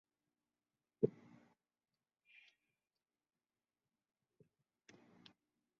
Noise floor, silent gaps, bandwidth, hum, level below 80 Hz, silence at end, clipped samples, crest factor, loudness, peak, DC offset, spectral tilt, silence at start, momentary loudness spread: under -90 dBFS; none; 7 kHz; none; -84 dBFS; 4.7 s; under 0.1%; 32 dB; -42 LUFS; -20 dBFS; under 0.1%; -8 dB/octave; 1 s; 26 LU